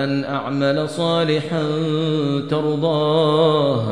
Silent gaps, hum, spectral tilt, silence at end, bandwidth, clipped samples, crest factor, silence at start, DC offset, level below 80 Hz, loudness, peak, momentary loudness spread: none; none; -7 dB/octave; 0 s; 10.5 kHz; under 0.1%; 14 dB; 0 s; 0.3%; -60 dBFS; -19 LUFS; -6 dBFS; 5 LU